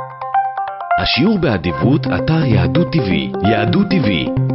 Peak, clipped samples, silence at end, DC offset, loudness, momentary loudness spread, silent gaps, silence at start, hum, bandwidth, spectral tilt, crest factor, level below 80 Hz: -2 dBFS; under 0.1%; 0 s; under 0.1%; -15 LUFS; 5 LU; none; 0 s; none; 6 kHz; -9.5 dB/octave; 12 dB; -36 dBFS